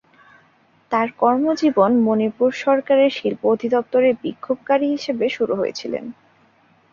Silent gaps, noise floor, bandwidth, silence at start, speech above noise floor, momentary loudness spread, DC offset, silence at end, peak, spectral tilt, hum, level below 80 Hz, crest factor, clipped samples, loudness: none; -57 dBFS; 7.4 kHz; 0.9 s; 39 dB; 10 LU; under 0.1%; 0.8 s; -4 dBFS; -6 dB/octave; none; -64 dBFS; 16 dB; under 0.1%; -19 LUFS